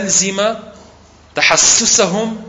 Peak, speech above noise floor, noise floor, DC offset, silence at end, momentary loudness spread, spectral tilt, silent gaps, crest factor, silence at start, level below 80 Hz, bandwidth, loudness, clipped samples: 0 dBFS; 30 dB; -43 dBFS; under 0.1%; 0 s; 13 LU; -1 dB/octave; none; 16 dB; 0 s; -46 dBFS; 11 kHz; -11 LUFS; under 0.1%